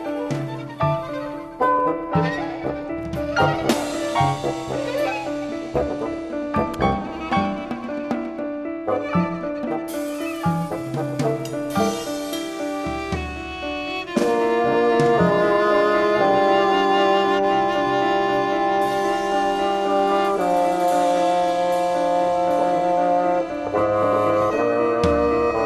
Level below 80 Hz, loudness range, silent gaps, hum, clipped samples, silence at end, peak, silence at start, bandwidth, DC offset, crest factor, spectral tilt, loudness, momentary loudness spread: -44 dBFS; 7 LU; none; none; under 0.1%; 0 s; -2 dBFS; 0 s; 14 kHz; under 0.1%; 18 dB; -6 dB/octave; -21 LUFS; 10 LU